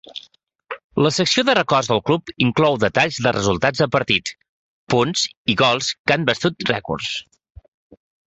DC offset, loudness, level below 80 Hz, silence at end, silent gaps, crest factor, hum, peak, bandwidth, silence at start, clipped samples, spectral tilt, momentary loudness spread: under 0.1%; -19 LUFS; -50 dBFS; 1.1 s; 0.84-0.90 s, 4.49-4.87 s, 5.37-5.45 s, 5.99-6.05 s; 18 dB; none; -2 dBFS; 8.4 kHz; 0.1 s; under 0.1%; -4 dB/octave; 11 LU